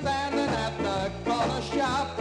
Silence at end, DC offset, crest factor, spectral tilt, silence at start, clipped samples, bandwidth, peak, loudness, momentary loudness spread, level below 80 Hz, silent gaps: 0 s; under 0.1%; 12 dB; -5 dB/octave; 0 s; under 0.1%; 12 kHz; -14 dBFS; -28 LUFS; 2 LU; -46 dBFS; none